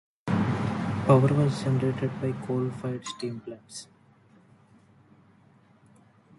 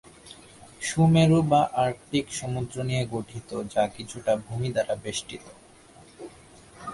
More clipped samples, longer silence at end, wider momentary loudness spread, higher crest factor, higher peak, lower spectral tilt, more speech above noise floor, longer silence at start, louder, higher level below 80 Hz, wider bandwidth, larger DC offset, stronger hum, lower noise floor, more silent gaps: neither; first, 2.55 s vs 0 s; second, 19 LU vs 25 LU; about the same, 22 dB vs 18 dB; about the same, -8 dBFS vs -8 dBFS; first, -7.5 dB/octave vs -6 dB/octave; first, 33 dB vs 27 dB; about the same, 0.25 s vs 0.25 s; about the same, -27 LUFS vs -26 LUFS; about the same, -58 dBFS vs -54 dBFS; about the same, 11.5 kHz vs 11.5 kHz; neither; neither; first, -59 dBFS vs -52 dBFS; neither